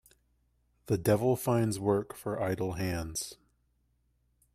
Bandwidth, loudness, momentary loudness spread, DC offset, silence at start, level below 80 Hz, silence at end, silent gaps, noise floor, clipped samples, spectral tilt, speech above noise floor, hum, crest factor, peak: 15.5 kHz; -31 LUFS; 10 LU; under 0.1%; 0.85 s; -58 dBFS; 1.2 s; none; -73 dBFS; under 0.1%; -6 dB/octave; 43 dB; none; 20 dB; -14 dBFS